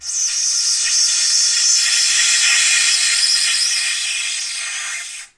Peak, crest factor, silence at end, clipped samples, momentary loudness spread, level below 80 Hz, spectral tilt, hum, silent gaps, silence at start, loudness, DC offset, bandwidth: -2 dBFS; 14 dB; 0.1 s; under 0.1%; 10 LU; -62 dBFS; 6.5 dB/octave; none; none; 0 s; -13 LUFS; under 0.1%; 12 kHz